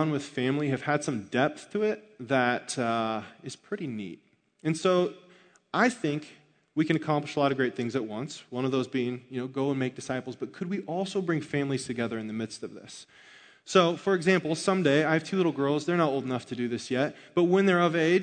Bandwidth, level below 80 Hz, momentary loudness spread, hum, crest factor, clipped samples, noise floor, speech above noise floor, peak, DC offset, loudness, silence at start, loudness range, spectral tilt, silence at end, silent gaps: 9.4 kHz; -74 dBFS; 12 LU; none; 22 dB; under 0.1%; -58 dBFS; 30 dB; -6 dBFS; under 0.1%; -28 LUFS; 0 s; 6 LU; -5.5 dB/octave; 0 s; none